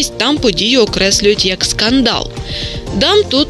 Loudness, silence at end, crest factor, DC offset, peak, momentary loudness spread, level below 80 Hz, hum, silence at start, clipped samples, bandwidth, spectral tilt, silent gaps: -12 LUFS; 0 s; 12 dB; under 0.1%; 0 dBFS; 10 LU; -30 dBFS; none; 0 s; under 0.1%; 13 kHz; -3 dB/octave; none